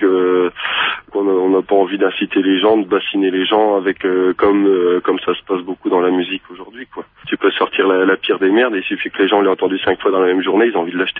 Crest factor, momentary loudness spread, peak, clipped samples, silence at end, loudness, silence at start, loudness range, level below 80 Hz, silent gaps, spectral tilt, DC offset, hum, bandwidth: 14 dB; 7 LU; -2 dBFS; under 0.1%; 0 s; -15 LUFS; 0 s; 3 LU; -56 dBFS; none; -8.5 dB/octave; under 0.1%; none; 4 kHz